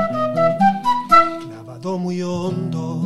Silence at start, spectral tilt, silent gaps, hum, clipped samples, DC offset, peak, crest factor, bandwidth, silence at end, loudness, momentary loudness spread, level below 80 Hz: 0 s; -6.5 dB/octave; none; none; under 0.1%; under 0.1%; 0 dBFS; 18 dB; 13 kHz; 0 s; -18 LUFS; 15 LU; -52 dBFS